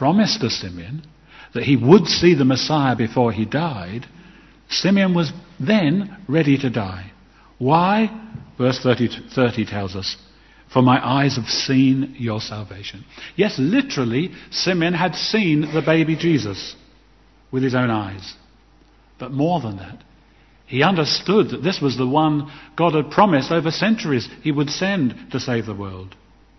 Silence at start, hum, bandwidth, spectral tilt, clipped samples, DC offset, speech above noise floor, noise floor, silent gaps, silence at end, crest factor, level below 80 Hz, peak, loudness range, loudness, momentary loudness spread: 0 s; none; 6.2 kHz; -6 dB/octave; under 0.1%; under 0.1%; 34 dB; -52 dBFS; none; 0.5 s; 20 dB; -52 dBFS; 0 dBFS; 5 LU; -19 LUFS; 15 LU